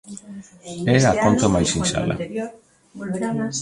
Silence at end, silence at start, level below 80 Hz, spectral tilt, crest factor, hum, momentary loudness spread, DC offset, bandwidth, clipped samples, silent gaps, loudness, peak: 0 s; 0.05 s; -42 dBFS; -5 dB/octave; 20 dB; none; 20 LU; under 0.1%; 11.5 kHz; under 0.1%; none; -20 LUFS; -2 dBFS